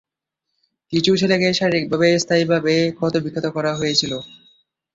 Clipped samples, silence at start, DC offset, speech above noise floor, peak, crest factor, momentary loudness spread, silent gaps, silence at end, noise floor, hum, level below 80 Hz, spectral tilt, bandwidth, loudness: under 0.1%; 0.9 s; under 0.1%; 61 dB; -2 dBFS; 18 dB; 7 LU; none; 0.65 s; -80 dBFS; none; -56 dBFS; -4.5 dB/octave; 7.8 kHz; -18 LUFS